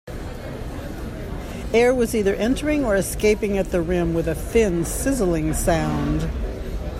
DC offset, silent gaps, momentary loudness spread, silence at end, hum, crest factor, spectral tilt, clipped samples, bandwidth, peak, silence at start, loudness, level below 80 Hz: under 0.1%; none; 13 LU; 0 s; none; 16 dB; -5.5 dB/octave; under 0.1%; 16 kHz; -6 dBFS; 0.05 s; -22 LUFS; -32 dBFS